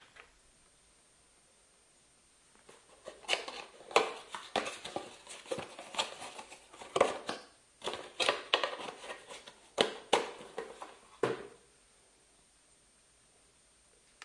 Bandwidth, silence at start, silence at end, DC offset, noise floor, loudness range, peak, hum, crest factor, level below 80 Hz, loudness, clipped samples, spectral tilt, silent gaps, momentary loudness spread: 11.5 kHz; 0 s; 0 s; under 0.1%; -66 dBFS; 9 LU; -6 dBFS; none; 32 dB; -76 dBFS; -36 LUFS; under 0.1%; -2 dB/octave; none; 19 LU